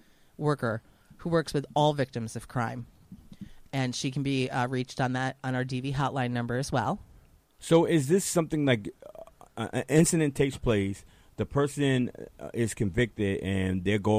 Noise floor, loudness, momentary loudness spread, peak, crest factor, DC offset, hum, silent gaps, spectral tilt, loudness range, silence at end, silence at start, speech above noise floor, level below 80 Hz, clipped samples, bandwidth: -57 dBFS; -28 LUFS; 16 LU; -8 dBFS; 20 dB; under 0.1%; none; none; -5.5 dB/octave; 5 LU; 0 s; 0.4 s; 30 dB; -52 dBFS; under 0.1%; 15.5 kHz